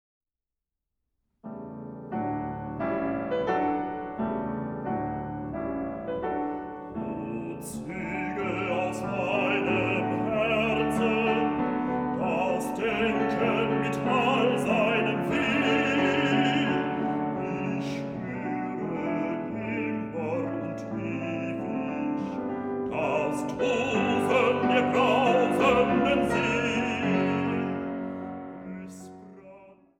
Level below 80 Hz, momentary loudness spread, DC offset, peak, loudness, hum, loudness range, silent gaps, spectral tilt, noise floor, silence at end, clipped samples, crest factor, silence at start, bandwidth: -56 dBFS; 11 LU; under 0.1%; -10 dBFS; -27 LUFS; none; 8 LU; none; -6 dB/octave; -89 dBFS; 0.25 s; under 0.1%; 18 dB; 1.45 s; 15.5 kHz